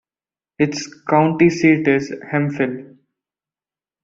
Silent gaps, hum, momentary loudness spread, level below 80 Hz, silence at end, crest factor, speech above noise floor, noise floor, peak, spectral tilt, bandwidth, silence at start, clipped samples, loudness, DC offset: none; none; 9 LU; -58 dBFS; 1.2 s; 16 dB; over 73 dB; under -90 dBFS; -2 dBFS; -6.5 dB/octave; 7.6 kHz; 0.6 s; under 0.1%; -18 LUFS; under 0.1%